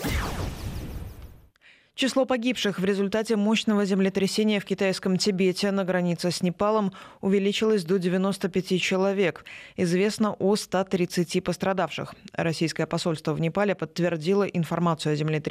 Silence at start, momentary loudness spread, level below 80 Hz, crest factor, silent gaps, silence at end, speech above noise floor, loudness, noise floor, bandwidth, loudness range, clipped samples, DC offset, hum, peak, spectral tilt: 0 s; 8 LU; -46 dBFS; 14 dB; none; 0 s; 33 dB; -25 LUFS; -57 dBFS; 15.5 kHz; 3 LU; under 0.1%; under 0.1%; none; -12 dBFS; -5.5 dB/octave